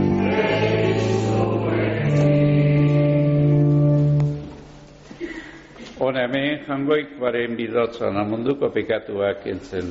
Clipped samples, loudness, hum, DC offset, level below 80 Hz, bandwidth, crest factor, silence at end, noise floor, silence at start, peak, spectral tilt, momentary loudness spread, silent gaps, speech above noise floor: under 0.1%; -20 LUFS; none; under 0.1%; -46 dBFS; 7.8 kHz; 12 dB; 0 s; -43 dBFS; 0 s; -8 dBFS; -7 dB/octave; 15 LU; none; 20 dB